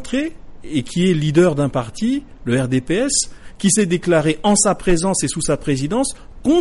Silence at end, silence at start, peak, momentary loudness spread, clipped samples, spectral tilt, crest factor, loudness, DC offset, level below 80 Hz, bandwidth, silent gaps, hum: 0 s; 0 s; -4 dBFS; 9 LU; under 0.1%; -4.5 dB/octave; 14 dB; -18 LUFS; under 0.1%; -36 dBFS; 11.5 kHz; none; none